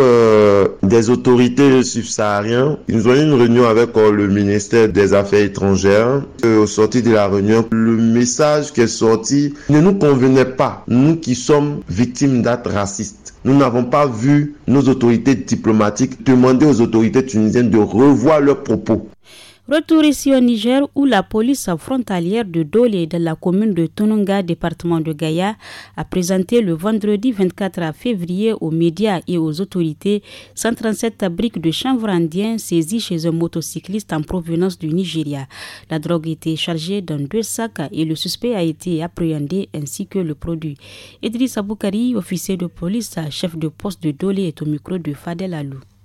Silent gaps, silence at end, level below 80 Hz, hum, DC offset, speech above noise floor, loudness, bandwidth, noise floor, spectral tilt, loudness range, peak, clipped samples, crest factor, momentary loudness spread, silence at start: none; 0.25 s; -46 dBFS; none; under 0.1%; 28 dB; -16 LUFS; 15.5 kHz; -43 dBFS; -6 dB/octave; 8 LU; -4 dBFS; under 0.1%; 12 dB; 11 LU; 0 s